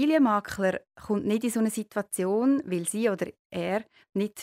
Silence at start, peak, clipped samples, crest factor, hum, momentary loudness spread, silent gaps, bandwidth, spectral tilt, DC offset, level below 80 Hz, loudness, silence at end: 0 s; -12 dBFS; under 0.1%; 14 dB; none; 9 LU; 3.39-3.50 s; 16 kHz; -5 dB/octave; under 0.1%; -64 dBFS; -28 LUFS; 0 s